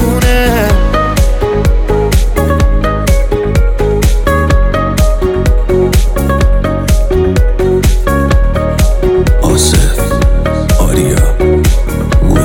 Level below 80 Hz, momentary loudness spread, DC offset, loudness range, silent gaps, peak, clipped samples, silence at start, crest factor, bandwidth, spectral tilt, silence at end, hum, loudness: -10 dBFS; 3 LU; under 0.1%; 1 LU; none; 0 dBFS; under 0.1%; 0 s; 8 dB; 17 kHz; -5.5 dB/octave; 0 s; none; -11 LUFS